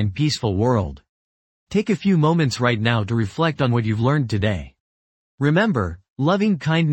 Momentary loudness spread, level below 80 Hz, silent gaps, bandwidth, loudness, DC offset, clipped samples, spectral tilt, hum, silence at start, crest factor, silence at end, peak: 6 LU; -46 dBFS; 1.09-1.67 s, 4.80-5.38 s, 6.10-6.16 s; 8.8 kHz; -20 LUFS; under 0.1%; under 0.1%; -6.5 dB/octave; none; 0 s; 18 dB; 0 s; -2 dBFS